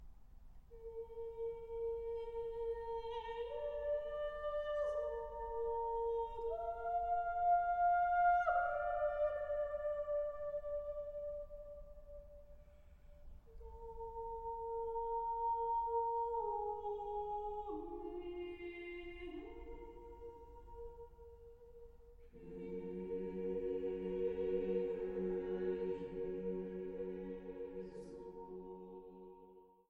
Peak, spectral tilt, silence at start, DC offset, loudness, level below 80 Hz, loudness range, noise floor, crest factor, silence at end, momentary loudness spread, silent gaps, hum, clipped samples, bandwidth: -24 dBFS; -8 dB/octave; 0 s; under 0.1%; -41 LUFS; -58 dBFS; 15 LU; -63 dBFS; 16 dB; 0.25 s; 18 LU; none; none; under 0.1%; 6.6 kHz